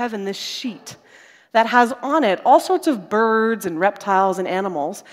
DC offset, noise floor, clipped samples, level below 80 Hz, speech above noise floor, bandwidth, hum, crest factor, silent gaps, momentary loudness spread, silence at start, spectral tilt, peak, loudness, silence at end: under 0.1%; -49 dBFS; under 0.1%; -72 dBFS; 30 dB; 16 kHz; none; 18 dB; none; 11 LU; 0 s; -4.5 dB/octave; 0 dBFS; -19 LUFS; 0.1 s